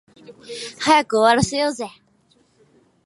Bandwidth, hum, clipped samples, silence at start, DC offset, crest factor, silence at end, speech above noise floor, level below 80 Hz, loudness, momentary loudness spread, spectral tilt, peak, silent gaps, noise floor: 11.5 kHz; none; under 0.1%; 0.3 s; under 0.1%; 20 dB; 1.15 s; 41 dB; -50 dBFS; -18 LUFS; 17 LU; -4 dB/octave; 0 dBFS; none; -60 dBFS